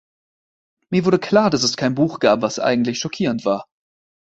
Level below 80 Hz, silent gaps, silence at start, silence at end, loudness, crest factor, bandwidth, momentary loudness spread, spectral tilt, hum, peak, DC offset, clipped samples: -58 dBFS; none; 0.9 s; 0.7 s; -19 LUFS; 20 dB; 8.2 kHz; 7 LU; -5 dB/octave; none; 0 dBFS; under 0.1%; under 0.1%